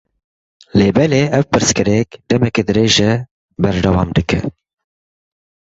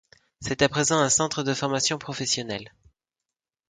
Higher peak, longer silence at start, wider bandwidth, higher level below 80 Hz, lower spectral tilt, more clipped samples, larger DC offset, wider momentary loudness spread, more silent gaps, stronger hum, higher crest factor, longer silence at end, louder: first, 0 dBFS vs -4 dBFS; first, 0.75 s vs 0.4 s; second, 8 kHz vs 9.8 kHz; first, -34 dBFS vs -56 dBFS; first, -5 dB/octave vs -3 dB/octave; neither; neither; second, 7 LU vs 13 LU; first, 3.31-3.48 s vs none; neither; second, 14 dB vs 22 dB; first, 1.15 s vs 1 s; first, -15 LUFS vs -24 LUFS